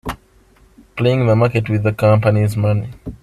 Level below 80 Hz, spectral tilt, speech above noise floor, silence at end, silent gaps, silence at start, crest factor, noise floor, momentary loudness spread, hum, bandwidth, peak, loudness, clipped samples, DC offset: -42 dBFS; -8 dB/octave; 35 dB; 0.1 s; none; 0.05 s; 16 dB; -50 dBFS; 16 LU; none; 13 kHz; 0 dBFS; -16 LUFS; under 0.1%; under 0.1%